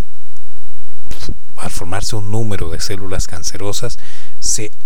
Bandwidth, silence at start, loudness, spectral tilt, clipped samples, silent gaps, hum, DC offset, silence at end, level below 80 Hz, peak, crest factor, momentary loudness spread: 19 kHz; 0 s; -23 LUFS; -3.5 dB/octave; under 0.1%; none; none; 60%; 0 s; -30 dBFS; 0 dBFS; 14 dB; 14 LU